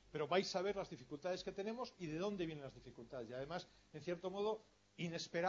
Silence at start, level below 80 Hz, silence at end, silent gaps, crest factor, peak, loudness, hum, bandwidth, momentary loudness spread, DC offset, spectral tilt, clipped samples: 0.05 s; -72 dBFS; 0 s; none; 22 dB; -24 dBFS; -45 LUFS; none; 7.4 kHz; 14 LU; under 0.1%; -4 dB/octave; under 0.1%